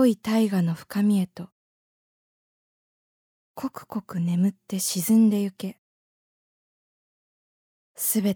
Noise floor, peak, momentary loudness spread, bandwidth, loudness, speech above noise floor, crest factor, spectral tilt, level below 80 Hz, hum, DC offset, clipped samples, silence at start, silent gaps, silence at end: under -90 dBFS; -10 dBFS; 16 LU; over 20 kHz; -24 LUFS; over 66 dB; 18 dB; -5.5 dB/octave; -72 dBFS; none; under 0.1%; under 0.1%; 0 s; 1.52-3.54 s, 5.78-7.95 s; 0 s